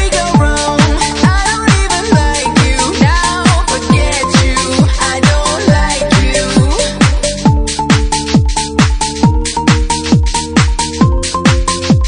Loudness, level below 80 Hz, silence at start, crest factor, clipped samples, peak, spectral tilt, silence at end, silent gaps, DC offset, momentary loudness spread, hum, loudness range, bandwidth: -11 LUFS; -18 dBFS; 0 s; 10 dB; 0.2%; 0 dBFS; -4.5 dB/octave; 0 s; none; under 0.1%; 2 LU; none; 1 LU; 10.5 kHz